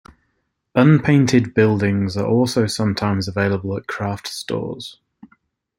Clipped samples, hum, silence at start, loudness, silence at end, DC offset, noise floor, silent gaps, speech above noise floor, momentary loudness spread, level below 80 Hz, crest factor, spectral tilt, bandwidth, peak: under 0.1%; none; 0.75 s; -18 LUFS; 0.85 s; under 0.1%; -71 dBFS; none; 53 dB; 12 LU; -54 dBFS; 18 dB; -6.5 dB/octave; 16 kHz; -2 dBFS